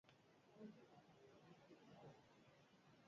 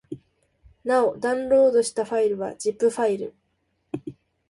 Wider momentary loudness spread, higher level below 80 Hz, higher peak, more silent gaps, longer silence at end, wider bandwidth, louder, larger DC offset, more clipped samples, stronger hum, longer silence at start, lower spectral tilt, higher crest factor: second, 6 LU vs 18 LU; second, under -90 dBFS vs -62 dBFS; second, -48 dBFS vs -8 dBFS; neither; second, 0 s vs 0.4 s; second, 7.2 kHz vs 11.5 kHz; second, -66 LUFS vs -23 LUFS; neither; neither; neither; about the same, 0.05 s vs 0.1 s; about the same, -5 dB/octave vs -4.5 dB/octave; about the same, 20 dB vs 16 dB